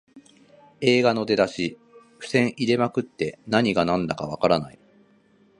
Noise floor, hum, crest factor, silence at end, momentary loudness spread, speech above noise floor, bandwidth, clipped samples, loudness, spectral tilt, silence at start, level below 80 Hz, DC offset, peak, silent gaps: -59 dBFS; none; 22 dB; 0.9 s; 10 LU; 36 dB; 11 kHz; under 0.1%; -23 LUFS; -5.5 dB/octave; 0.15 s; -58 dBFS; under 0.1%; -4 dBFS; none